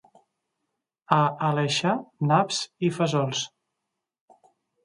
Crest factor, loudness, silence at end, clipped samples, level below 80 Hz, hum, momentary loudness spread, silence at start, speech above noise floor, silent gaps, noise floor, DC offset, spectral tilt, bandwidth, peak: 24 dB; -25 LUFS; 1.35 s; under 0.1%; -70 dBFS; none; 6 LU; 1.1 s; 59 dB; none; -83 dBFS; under 0.1%; -5 dB/octave; 11.5 kHz; -2 dBFS